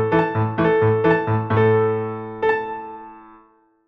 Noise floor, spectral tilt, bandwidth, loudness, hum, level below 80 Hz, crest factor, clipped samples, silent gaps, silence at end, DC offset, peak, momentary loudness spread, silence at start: -55 dBFS; -9.5 dB/octave; 5.4 kHz; -19 LUFS; none; -52 dBFS; 14 dB; under 0.1%; none; 0.65 s; under 0.1%; -6 dBFS; 13 LU; 0 s